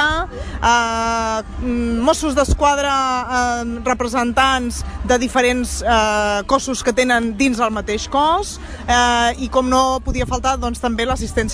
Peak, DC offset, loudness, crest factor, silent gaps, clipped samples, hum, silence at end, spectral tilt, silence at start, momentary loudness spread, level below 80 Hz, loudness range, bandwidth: -2 dBFS; under 0.1%; -17 LUFS; 16 dB; none; under 0.1%; none; 0 s; -3.5 dB/octave; 0 s; 6 LU; -30 dBFS; 1 LU; 11 kHz